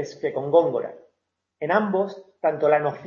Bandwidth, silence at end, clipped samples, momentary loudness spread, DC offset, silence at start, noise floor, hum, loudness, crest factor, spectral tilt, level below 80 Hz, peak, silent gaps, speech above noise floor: 7.2 kHz; 0 s; under 0.1%; 10 LU; under 0.1%; 0 s; -77 dBFS; none; -23 LUFS; 18 dB; -7 dB/octave; -74 dBFS; -4 dBFS; none; 55 dB